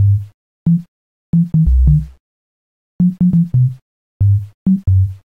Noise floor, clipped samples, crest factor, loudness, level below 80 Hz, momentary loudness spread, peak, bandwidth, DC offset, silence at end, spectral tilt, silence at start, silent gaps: under -90 dBFS; under 0.1%; 14 dB; -15 LUFS; -22 dBFS; 6 LU; 0 dBFS; 1.1 kHz; 0.3%; 0.2 s; -12 dB/octave; 0 s; 0.34-0.66 s, 0.88-1.33 s, 2.20-2.99 s, 3.82-4.20 s, 4.54-4.66 s